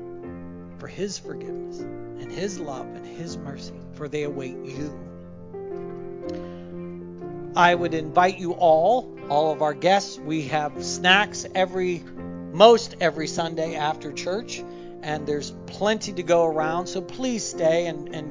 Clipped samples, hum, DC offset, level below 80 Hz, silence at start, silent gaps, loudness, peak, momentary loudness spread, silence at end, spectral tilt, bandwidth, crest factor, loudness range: under 0.1%; none; under 0.1%; -56 dBFS; 0 s; none; -24 LUFS; 0 dBFS; 18 LU; 0 s; -4 dB/octave; 7.6 kHz; 24 dB; 13 LU